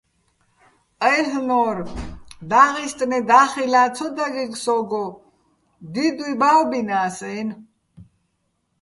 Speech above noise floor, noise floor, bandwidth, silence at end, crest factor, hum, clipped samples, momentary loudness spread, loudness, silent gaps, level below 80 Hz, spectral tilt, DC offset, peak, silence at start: 51 dB; -71 dBFS; 11.5 kHz; 0.8 s; 20 dB; none; under 0.1%; 15 LU; -19 LUFS; none; -48 dBFS; -4 dB/octave; under 0.1%; 0 dBFS; 1 s